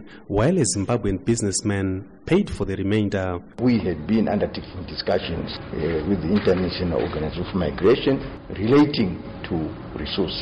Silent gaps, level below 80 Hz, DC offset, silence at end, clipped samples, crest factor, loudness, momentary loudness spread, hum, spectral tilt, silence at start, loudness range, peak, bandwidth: none; -40 dBFS; under 0.1%; 0 s; under 0.1%; 12 dB; -23 LUFS; 10 LU; none; -5.5 dB/octave; 0 s; 3 LU; -10 dBFS; 11 kHz